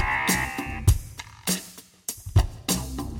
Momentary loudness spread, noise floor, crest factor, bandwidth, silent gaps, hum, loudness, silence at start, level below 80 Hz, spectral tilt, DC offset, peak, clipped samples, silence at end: 12 LU; -45 dBFS; 20 dB; 17.5 kHz; none; none; -26 LUFS; 0 s; -32 dBFS; -4 dB/octave; under 0.1%; -6 dBFS; under 0.1%; 0 s